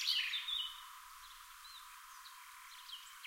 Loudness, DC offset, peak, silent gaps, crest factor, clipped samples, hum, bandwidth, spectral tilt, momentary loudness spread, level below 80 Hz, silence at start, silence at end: -41 LUFS; under 0.1%; -22 dBFS; none; 24 dB; under 0.1%; none; 16 kHz; 6.5 dB/octave; 18 LU; -76 dBFS; 0 s; 0 s